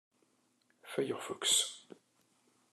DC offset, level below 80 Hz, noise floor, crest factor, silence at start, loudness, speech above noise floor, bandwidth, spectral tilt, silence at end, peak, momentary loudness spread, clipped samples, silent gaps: under 0.1%; under -90 dBFS; -74 dBFS; 22 dB; 0.85 s; -33 LUFS; 39 dB; 13 kHz; -1 dB/octave; 0.9 s; -18 dBFS; 13 LU; under 0.1%; none